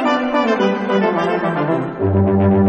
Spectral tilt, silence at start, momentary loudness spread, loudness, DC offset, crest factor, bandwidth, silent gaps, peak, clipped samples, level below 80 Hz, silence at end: -8 dB/octave; 0 s; 4 LU; -17 LUFS; under 0.1%; 12 dB; 7.6 kHz; none; -4 dBFS; under 0.1%; -50 dBFS; 0 s